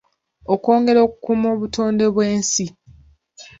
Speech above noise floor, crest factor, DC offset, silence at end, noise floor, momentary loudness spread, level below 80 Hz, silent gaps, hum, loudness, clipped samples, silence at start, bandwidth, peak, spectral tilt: 32 dB; 16 dB; under 0.1%; 0.15 s; -49 dBFS; 8 LU; -52 dBFS; none; none; -18 LUFS; under 0.1%; 0.5 s; 8 kHz; -2 dBFS; -4.5 dB/octave